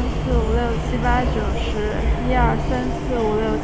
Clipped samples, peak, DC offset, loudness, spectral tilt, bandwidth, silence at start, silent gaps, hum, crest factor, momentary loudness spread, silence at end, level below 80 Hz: under 0.1%; -6 dBFS; under 0.1%; -21 LUFS; -7 dB/octave; 8 kHz; 0 s; none; none; 14 dB; 4 LU; 0 s; -24 dBFS